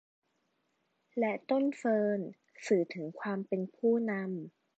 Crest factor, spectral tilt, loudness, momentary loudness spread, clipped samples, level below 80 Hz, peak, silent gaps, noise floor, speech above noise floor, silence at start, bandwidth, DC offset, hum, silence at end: 18 dB; -7 dB/octave; -33 LUFS; 11 LU; under 0.1%; -88 dBFS; -16 dBFS; none; -78 dBFS; 46 dB; 1.15 s; 8.4 kHz; under 0.1%; none; 0.3 s